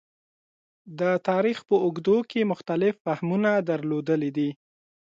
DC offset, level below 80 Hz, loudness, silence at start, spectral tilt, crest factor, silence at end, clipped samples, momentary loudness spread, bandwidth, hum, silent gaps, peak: under 0.1%; -72 dBFS; -25 LUFS; 0.85 s; -8 dB/octave; 16 dB; 0.6 s; under 0.1%; 6 LU; 7.6 kHz; none; 3.00-3.05 s; -10 dBFS